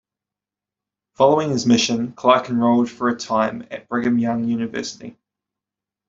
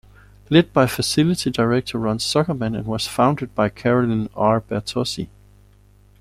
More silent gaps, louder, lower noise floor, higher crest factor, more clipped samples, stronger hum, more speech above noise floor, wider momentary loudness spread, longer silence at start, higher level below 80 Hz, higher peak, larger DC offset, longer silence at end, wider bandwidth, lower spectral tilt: neither; about the same, -19 LUFS vs -20 LUFS; first, -88 dBFS vs -51 dBFS; about the same, 18 dB vs 18 dB; neither; about the same, 50 Hz at -50 dBFS vs 50 Hz at -40 dBFS; first, 69 dB vs 32 dB; first, 12 LU vs 7 LU; first, 1.2 s vs 0.5 s; second, -60 dBFS vs -48 dBFS; about the same, -2 dBFS vs -2 dBFS; neither; about the same, 0.95 s vs 0.95 s; second, 7.8 kHz vs 15.5 kHz; about the same, -5 dB/octave vs -5.5 dB/octave